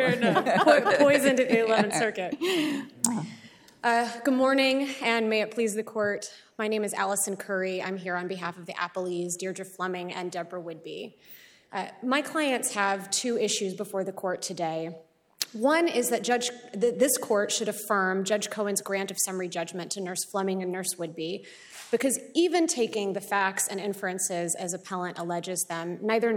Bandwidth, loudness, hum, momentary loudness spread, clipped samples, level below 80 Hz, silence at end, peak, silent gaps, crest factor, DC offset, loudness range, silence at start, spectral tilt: 19.5 kHz; -27 LUFS; none; 12 LU; under 0.1%; -76 dBFS; 0 s; -6 dBFS; none; 22 dB; under 0.1%; 6 LU; 0 s; -3 dB/octave